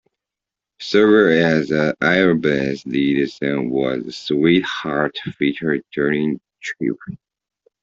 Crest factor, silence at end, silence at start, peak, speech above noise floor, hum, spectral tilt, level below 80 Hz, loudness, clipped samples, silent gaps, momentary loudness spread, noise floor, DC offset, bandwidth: 16 dB; 0.65 s; 0.8 s; -2 dBFS; 69 dB; none; -6.5 dB/octave; -56 dBFS; -18 LUFS; under 0.1%; none; 11 LU; -86 dBFS; under 0.1%; 7.6 kHz